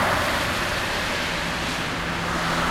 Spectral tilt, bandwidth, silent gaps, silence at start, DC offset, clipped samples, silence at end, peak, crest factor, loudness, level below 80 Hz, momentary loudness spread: -3.5 dB/octave; 16 kHz; none; 0 s; under 0.1%; under 0.1%; 0 s; -10 dBFS; 14 dB; -24 LUFS; -40 dBFS; 4 LU